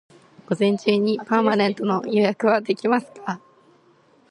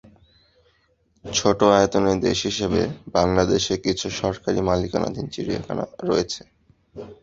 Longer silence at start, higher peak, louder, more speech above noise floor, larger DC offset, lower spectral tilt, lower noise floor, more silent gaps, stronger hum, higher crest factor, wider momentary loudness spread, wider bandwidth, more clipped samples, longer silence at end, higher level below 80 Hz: second, 0.5 s vs 1.25 s; about the same, -4 dBFS vs -2 dBFS; about the same, -21 LUFS vs -22 LUFS; second, 36 dB vs 42 dB; neither; first, -6.5 dB/octave vs -4.5 dB/octave; second, -57 dBFS vs -64 dBFS; neither; neither; about the same, 18 dB vs 20 dB; about the same, 12 LU vs 12 LU; first, 10.5 kHz vs 8 kHz; neither; first, 0.95 s vs 0.1 s; second, -72 dBFS vs -44 dBFS